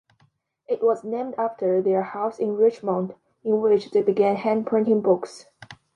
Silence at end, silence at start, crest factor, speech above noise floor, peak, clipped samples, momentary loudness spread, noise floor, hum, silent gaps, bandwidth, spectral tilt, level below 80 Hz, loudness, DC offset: 0.2 s; 0.7 s; 16 dB; 43 dB; -8 dBFS; under 0.1%; 8 LU; -65 dBFS; none; none; 9.6 kHz; -7.5 dB/octave; -72 dBFS; -23 LUFS; under 0.1%